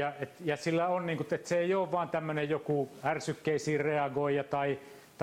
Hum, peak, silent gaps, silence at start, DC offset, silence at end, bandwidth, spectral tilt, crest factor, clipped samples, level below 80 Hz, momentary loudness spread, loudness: none; -18 dBFS; none; 0 s; under 0.1%; 0 s; 16 kHz; -6 dB/octave; 14 dB; under 0.1%; -72 dBFS; 5 LU; -32 LUFS